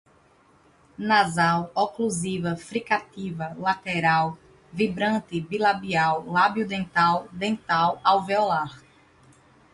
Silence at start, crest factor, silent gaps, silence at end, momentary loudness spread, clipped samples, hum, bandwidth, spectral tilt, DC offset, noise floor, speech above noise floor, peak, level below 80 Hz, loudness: 1 s; 20 dB; none; 0.95 s; 9 LU; under 0.1%; none; 11.5 kHz; -5 dB/octave; under 0.1%; -58 dBFS; 34 dB; -6 dBFS; -60 dBFS; -24 LUFS